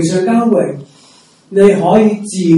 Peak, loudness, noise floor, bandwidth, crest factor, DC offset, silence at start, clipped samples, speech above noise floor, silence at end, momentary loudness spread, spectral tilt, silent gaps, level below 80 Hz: 0 dBFS; -12 LUFS; -45 dBFS; 11.5 kHz; 12 dB; under 0.1%; 0 s; 0.8%; 35 dB; 0 s; 10 LU; -6.5 dB/octave; none; -50 dBFS